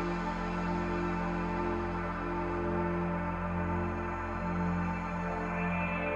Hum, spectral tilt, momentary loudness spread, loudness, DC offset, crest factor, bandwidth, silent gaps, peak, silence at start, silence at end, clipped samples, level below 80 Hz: none; -8 dB/octave; 3 LU; -34 LUFS; under 0.1%; 14 dB; 7.6 kHz; none; -20 dBFS; 0 s; 0 s; under 0.1%; -44 dBFS